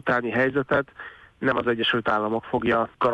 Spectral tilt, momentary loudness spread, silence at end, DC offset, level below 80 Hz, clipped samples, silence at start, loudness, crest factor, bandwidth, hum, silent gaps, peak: -7 dB/octave; 8 LU; 0 s; under 0.1%; -56 dBFS; under 0.1%; 0.05 s; -24 LUFS; 14 dB; 9 kHz; none; none; -10 dBFS